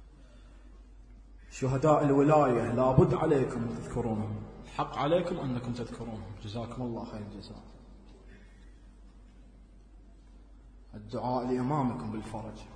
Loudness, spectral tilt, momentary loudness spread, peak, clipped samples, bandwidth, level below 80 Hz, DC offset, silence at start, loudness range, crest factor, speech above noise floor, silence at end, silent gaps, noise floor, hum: -30 LUFS; -8 dB/octave; 18 LU; -8 dBFS; under 0.1%; 10 kHz; -50 dBFS; under 0.1%; 0 s; 16 LU; 22 dB; 24 dB; 0 s; none; -54 dBFS; none